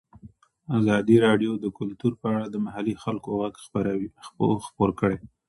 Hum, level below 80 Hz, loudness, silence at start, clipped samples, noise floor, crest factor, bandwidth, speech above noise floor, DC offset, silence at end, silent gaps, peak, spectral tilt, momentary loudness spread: none; -54 dBFS; -25 LUFS; 0.25 s; under 0.1%; -51 dBFS; 20 dB; 11.5 kHz; 27 dB; under 0.1%; 0.2 s; none; -6 dBFS; -7.5 dB/octave; 11 LU